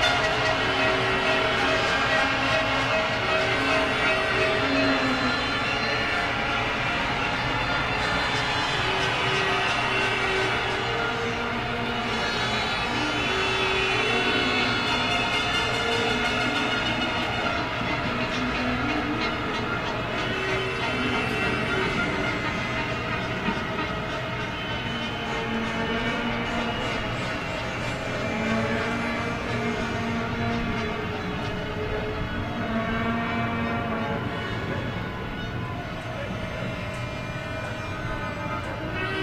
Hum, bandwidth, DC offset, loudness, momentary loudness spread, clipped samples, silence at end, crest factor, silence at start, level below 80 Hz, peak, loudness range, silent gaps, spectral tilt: none; 14.5 kHz; under 0.1%; -25 LUFS; 8 LU; under 0.1%; 0 s; 18 dB; 0 s; -42 dBFS; -8 dBFS; 6 LU; none; -4.5 dB/octave